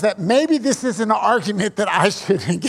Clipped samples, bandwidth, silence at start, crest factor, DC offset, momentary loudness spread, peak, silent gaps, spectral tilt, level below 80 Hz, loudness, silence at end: under 0.1%; 15 kHz; 0 s; 16 dB; under 0.1%; 4 LU; -2 dBFS; none; -4.5 dB/octave; -62 dBFS; -18 LUFS; 0 s